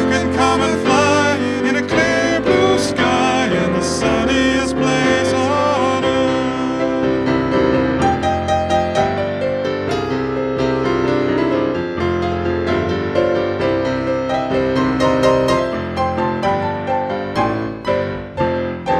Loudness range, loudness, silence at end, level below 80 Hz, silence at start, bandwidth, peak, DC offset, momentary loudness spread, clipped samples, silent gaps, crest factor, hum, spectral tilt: 3 LU; -17 LUFS; 0 s; -38 dBFS; 0 s; 12 kHz; -2 dBFS; under 0.1%; 6 LU; under 0.1%; none; 14 dB; none; -5.5 dB/octave